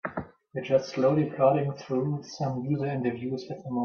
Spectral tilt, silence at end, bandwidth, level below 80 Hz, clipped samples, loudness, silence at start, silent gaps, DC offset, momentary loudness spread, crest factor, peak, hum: -7.5 dB/octave; 0 s; 6.8 kHz; -66 dBFS; under 0.1%; -28 LUFS; 0.05 s; none; under 0.1%; 12 LU; 18 dB; -8 dBFS; none